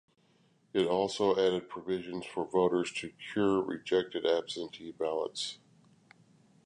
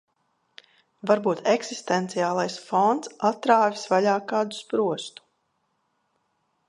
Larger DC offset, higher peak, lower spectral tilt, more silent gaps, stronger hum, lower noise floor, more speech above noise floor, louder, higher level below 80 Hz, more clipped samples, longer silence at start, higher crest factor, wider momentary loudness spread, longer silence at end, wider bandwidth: neither; second, -14 dBFS vs -4 dBFS; about the same, -5 dB/octave vs -4.5 dB/octave; neither; neither; second, -68 dBFS vs -73 dBFS; second, 37 dB vs 49 dB; second, -32 LUFS vs -24 LUFS; first, -70 dBFS vs -78 dBFS; neither; second, 0.75 s vs 1.05 s; about the same, 18 dB vs 22 dB; first, 10 LU vs 7 LU; second, 1.1 s vs 1.6 s; about the same, 11 kHz vs 11.5 kHz